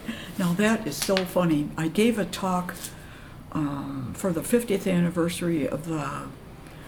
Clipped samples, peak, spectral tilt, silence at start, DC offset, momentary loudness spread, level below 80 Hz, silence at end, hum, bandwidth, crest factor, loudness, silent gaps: under 0.1%; -4 dBFS; -5.5 dB/octave; 0 s; under 0.1%; 14 LU; -50 dBFS; 0 s; none; over 20 kHz; 22 dB; -26 LUFS; none